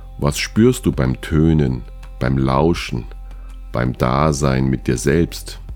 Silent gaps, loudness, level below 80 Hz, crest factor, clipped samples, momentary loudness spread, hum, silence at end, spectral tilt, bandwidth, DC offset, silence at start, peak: none; -18 LUFS; -30 dBFS; 18 dB; under 0.1%; 15 LU; none; 0 s; -6.5 dB/octave; 17.5 kHz; under 0.1%; 0 s; 0 dBFS